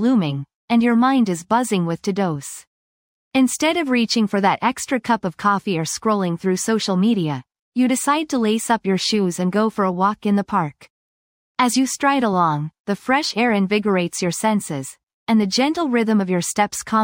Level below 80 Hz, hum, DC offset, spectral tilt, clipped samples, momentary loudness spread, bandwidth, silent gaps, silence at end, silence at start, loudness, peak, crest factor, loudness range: -62 dBFS; none; under 0.1%; -4.5 dB/octave; under 0.1%; 8 LU; 16.5 kHz; 0.55-0.68 s, 2.67-3.31 s, 7.59-7.72 s, 10.90-11.55 s, 12.79-12.84 s, 15.03-15.07 s, 15.13-15.26 s; 0 s; 0 s; -19 LUFS; -4 dBFS; 16 dB; 1 LU